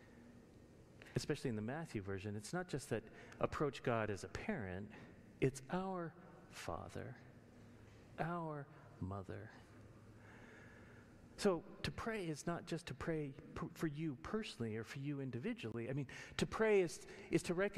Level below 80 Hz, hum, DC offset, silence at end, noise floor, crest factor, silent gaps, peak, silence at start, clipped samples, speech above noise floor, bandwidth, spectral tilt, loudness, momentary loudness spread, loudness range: -66 dBFS; none; under 0.1%; 0 s; -62 dBFS; 22 dB; none; -22 dBFS; 0 s; under 0.1%; 20 dB; 14.5 kHz; -6 dB/octave; -43 LUFS; 22 LU; 8 LU